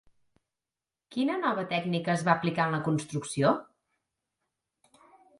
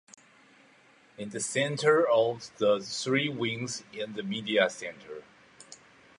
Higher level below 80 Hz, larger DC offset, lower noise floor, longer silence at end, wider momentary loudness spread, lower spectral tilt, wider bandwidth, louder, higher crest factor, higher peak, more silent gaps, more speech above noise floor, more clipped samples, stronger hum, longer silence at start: about the same, -72 dBFS vs -74 dBFS; neither; first, under -90 dBFS vs -60 dBFS; first, 1.75 s vs 0.45 s; second, 6 LU vs 21 LU; first, -6 dB/octave vs -4 dB/octave; about the same, 11.5 kHz vs 11.5 kHz; about the same, -29 LUFS vs -29 LUFS; about the same, 24 dB vs 20 dB; about the same, -8 dBFS vs -10 dBFS; neither; first, over 62 dB vs 31 dB; neither; neither; about the same, 1.1 s vs 1.2 s